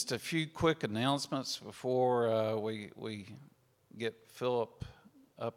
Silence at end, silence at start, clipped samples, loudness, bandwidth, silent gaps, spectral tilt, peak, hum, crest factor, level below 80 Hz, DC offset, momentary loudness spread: 0.05 s; 0 s; under 0.1%; -35 LUFS; 16.5 kHz; none; -5 dB/octave; -16 dBFS; none; 18 dB; -66 dBFS; under 0.1%; 13 LU